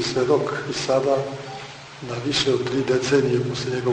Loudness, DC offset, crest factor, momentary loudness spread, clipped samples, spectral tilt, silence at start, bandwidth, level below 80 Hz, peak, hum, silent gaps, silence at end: -22 LUFS; under 0.1%; 16 dB; 14 LU; under 0.1%; -5 dB/octave; 0 s; 9.6 kHz; -56 dBFS; -6 dBFS; none; none; 0 s